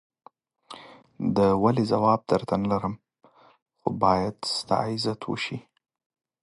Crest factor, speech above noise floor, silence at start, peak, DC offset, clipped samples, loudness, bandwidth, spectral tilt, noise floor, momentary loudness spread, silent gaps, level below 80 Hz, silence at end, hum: 20 dB; 24 dB; 0.7 s; -6 dBFS; under 0.1%; under 0.1%; -25 LUFS; 11.5 kHz; -6 dB/octave; -48 dBFS; 19 LU; 3.62-3.66 s; -56 dBFS; 0.85 s; none